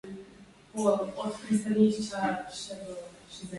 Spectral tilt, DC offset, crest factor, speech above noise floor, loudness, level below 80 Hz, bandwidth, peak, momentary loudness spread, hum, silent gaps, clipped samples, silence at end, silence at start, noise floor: -5.5 dB/octave; under 0.1%; 20 dB; 24 dB; -30 LUFS; -64 dBFS; 11.5 kHz; -12 dBFS; 19 LU; none; none; under 0.1%; 0 s; 0.05 s; -54 dBFS